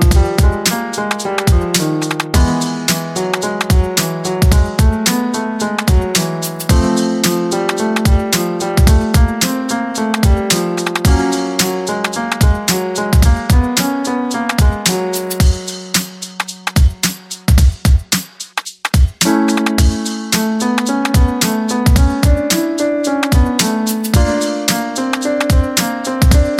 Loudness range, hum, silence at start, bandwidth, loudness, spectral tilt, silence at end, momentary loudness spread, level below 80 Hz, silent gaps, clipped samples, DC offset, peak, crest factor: 2 LU; none; 0 s; 16.5 kHz; -15 LUFS; -4.5 dB/octave; 0 s; 6 LU; -18 dBFS; none; under 0.1%; under 0.1%; 0 dBFS; 14 dB